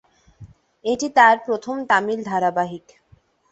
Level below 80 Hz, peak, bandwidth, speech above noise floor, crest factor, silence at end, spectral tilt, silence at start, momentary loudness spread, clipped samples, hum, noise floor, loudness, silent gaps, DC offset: -60 dBFS; 0 dBFS; 8.2 kHz; 37 dB; 20 dB; 0.75 s; -4 dB/octave; 0.4 s; 14 LU; under 0.1%; none; -57 dBFS; -19 LUFS; none; under 0.1%